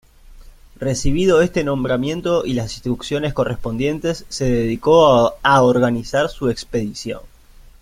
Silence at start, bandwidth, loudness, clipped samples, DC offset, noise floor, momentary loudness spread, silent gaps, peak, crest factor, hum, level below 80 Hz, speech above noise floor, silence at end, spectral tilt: 0.3 s; 15.5 kHz; -18 LUFS; under 0.1%; under 0.1%; -41 dBFS; 11 LU; none; 0 dBFS; 18 dB; none; -36 dBFS; 24 dB; 0.55 s; -5.5 dB/octave